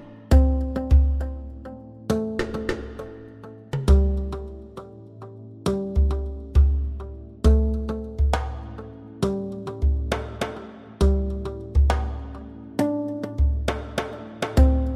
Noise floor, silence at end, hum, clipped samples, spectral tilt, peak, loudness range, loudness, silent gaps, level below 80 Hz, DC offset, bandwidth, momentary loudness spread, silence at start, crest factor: -42 dBFS; 0 s; none; under 0.1%; -7.5 dB/octave; -4 dBFS; 3 LU; -24 LUFS; none; -24 dBFS; under 0.1%; 11 kHz; 19 LU; 0 s; 18 dB